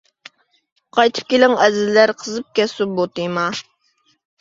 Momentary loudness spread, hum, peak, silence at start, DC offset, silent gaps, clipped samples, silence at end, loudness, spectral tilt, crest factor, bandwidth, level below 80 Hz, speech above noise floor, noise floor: 9 LU; none; 0 dBFS; 0.95 s; under 0.1%; none; under 0.1%; 0.8 s; -17 LUFS; -4 dB/octave; 18 dB; 7.8 kHz; -64 dBFS; 46 dB; -63 dBFS